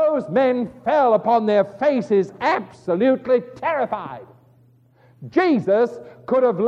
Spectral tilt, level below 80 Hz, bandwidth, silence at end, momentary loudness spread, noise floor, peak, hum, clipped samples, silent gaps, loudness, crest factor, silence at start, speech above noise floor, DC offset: -7.5 dB/octave; -64 dBFS; 7.8 kHz; 0 s; 8 LU; -55 dBFS; -4 dBFS; none; under 0.1%; none; -20 LUFS; 16 dB; 0 s; 35 dB; under 0.1%